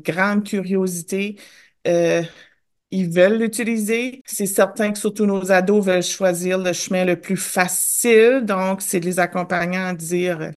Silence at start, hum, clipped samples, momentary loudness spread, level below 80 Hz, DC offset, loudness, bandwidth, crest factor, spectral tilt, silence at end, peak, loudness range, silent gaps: 0.05 s; none; under 0.1%; 8 LU; -66 dBFS; under 0.1%; -19 LUFS; 13 kHz; 18 dB; -4.5 dB/octave; 0.05 s; -2 dBFS; 3 LU; 4.21-4.25 s